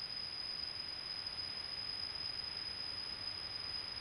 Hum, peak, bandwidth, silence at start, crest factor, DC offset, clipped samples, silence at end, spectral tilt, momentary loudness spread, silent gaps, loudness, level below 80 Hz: none; -30 dBFS; 15.5 kHz; 0 s; 12 dB; under 0.1%; under 0.1%; 0 s; -2 dB/octave; 1 LU; none; -41 LUFS; -66 dBFS